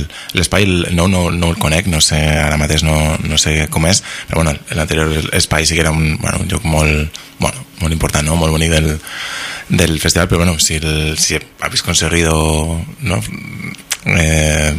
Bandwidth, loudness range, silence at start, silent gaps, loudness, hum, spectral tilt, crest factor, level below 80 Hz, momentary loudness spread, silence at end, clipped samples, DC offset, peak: 16 kHz; 3 LU; 0 s; none; -14 LUFS; none; -4 dB/octave; 14 dB; -24 dBFS; 8 LU; 0 s; under 0.1%; under 0.1%; 0 dBFS